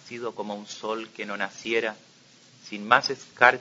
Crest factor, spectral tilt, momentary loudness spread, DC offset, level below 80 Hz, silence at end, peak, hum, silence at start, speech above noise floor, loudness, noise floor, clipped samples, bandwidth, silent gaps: 26 dB; -3 dB/octave; 15 LU; under 0.1%; -74 dBFS; 0 s; 0 dBFS; none; 0.05 s; 29 dB; -26 LUFS; -55 dBFS; under 0.1%; 7.8 kHz; none